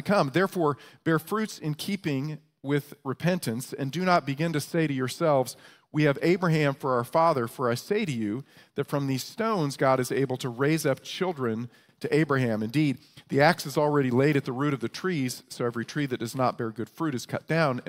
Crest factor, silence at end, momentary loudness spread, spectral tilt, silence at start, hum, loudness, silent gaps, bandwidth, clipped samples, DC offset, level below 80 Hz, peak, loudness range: 22 dB; 0.05 s; 9 LU; -6 dB/octave; 0 s; none; -27 LUFS; none; 16 kHz; under 0.1%; under 0.1%; -68 dBFS; -6 dBFS; 3 LU